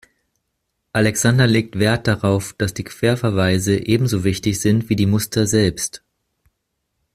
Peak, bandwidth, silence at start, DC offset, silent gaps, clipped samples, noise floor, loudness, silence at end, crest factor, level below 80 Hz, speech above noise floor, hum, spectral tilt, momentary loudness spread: -2 dBFS; 15.5 kHz; 0.95 s; under 0.1%; none; under 0.1%; -74 dBFS; -18 LUFS; 1.2 s; 16 dB; -46 dBFS; 57 dB; none; -5 dB/octave; 8 LU